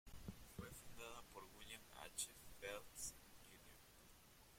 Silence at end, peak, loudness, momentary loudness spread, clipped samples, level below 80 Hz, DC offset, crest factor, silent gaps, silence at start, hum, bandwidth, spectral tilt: 0 s; -32 dBFS; -55 LUFS; 16 LU; under 0.1%; -68 dBFS; under 0.1%; 26 dB; none; 0.05 s; none; 16.5 kHz; -2 dB/octave